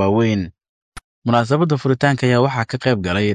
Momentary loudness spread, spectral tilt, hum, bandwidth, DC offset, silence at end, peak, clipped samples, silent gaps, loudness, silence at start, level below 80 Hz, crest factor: 6 LU; -7 dB/octave; none; 10.5 kHz; under 0.1%; 0 s; -2 dBFS; under 0.1%; 0.69-0.92 s, 1.04-1.22 s; -18 LUFS; 0 s; -44 dBFS; 16 dB